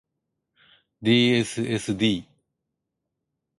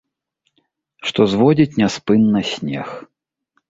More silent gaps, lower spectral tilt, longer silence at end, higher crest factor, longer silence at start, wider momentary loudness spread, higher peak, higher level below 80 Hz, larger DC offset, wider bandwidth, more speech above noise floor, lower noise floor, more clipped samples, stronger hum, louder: neither; second, -5 dB/octave vs -6.5 dB/octave; first, 1.4 s vs 0.7 s; about the same, 18 dB vs 16 dB; about the same, 1 s vs 1.05 s; second, 9 LU vs 13 LU; second, -8 dBFS vs -2 dBFS; second, -60 dBFS vs -54 dBFS; neither; first, 11.5 kHz vs 7.8 kHz; first, 60 dB vs 55 dB; first, -82 dBFS vs -71 dBFS; neither; neither; second, -23 LUFS vs -17 LUFS